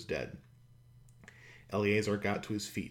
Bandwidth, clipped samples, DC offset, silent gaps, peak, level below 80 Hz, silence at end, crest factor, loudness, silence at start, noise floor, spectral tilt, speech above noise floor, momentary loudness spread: 16.5 kHz; under 0.1%; under 0.1%; none; -16 dBFS; -62 dBFS; 0 s; 20 dB; -34 LUFS; 0 s; -60 dBFS; -5.5 dB/octave; 26 dB; 24 LU